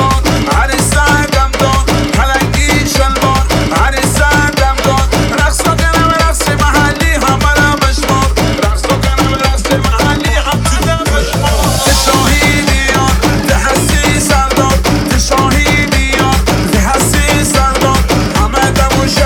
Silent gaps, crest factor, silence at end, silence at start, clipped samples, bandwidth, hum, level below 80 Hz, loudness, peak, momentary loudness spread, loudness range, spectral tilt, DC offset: none; 10 dB; 0 s; 0 s; under 0.1%; 19 kHz; none; -16 dBFS; -10 LUFS; 0 dBFS; 3 LU; 1 LU; -4 dB/octave; under 0.1%